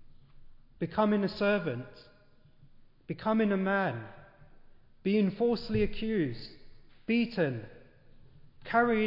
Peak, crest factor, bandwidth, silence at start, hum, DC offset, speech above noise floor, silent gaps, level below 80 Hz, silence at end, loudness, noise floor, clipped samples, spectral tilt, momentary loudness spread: -14 dBFS; 18 dB; 5.6 kHz; 0 s; none; under 0.1%; 30 dB; none; -52 dBFS; 0 s; -30 LUFS; -59 dBFS; under 0.1%; -9 dB/octave; 17 LU